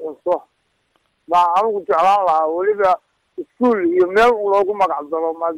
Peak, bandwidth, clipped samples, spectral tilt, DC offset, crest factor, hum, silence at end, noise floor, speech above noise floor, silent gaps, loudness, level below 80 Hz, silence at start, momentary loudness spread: -6 dBFS; 14 kHz; under 0.1%; -5 dB/octave; under 0.1%; 10 dB; none; 0 s; -65 dBFS; 49 dB; none; -17 LUFS; -54 dBFS; 0 s; 9 LU